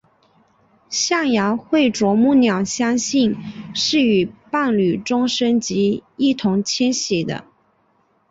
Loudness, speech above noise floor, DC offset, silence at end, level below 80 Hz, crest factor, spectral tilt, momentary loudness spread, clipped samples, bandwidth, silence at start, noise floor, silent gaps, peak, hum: -18 LUFS; 44 dB; under 0.1%; 0.9 s; -58 dBFS; 14 dB; -4 dB/octave; 6 LU; under 0.1%; 8 kHz; 0.9 s; -61 dBFS; none; -6 dBFS; none